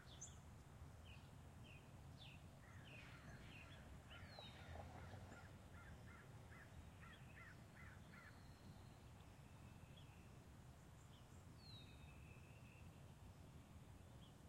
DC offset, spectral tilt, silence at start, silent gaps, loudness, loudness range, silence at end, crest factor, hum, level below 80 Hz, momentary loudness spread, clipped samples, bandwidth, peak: under 0.1%; -4.5 dB/octave; 0 s; none; -62 LUFS; 3 LU; 0 s; 18 dB; none; -70 dBFS; 5 LU; under 0.1%; 16 kHz; -42 dBFS